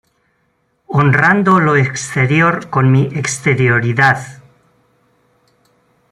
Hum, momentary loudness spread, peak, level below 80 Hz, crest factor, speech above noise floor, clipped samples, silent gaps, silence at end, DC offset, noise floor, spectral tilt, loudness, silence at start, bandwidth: none; 7 LU; 0 dBFS; -50 dBFS; 14 dB; 50 dB; under 0.1%; none; 1.75 s; under 0.1%; -62 dBFS; -6 dB/octave; -13 LUFS; 0.9 s; 11.5 kHz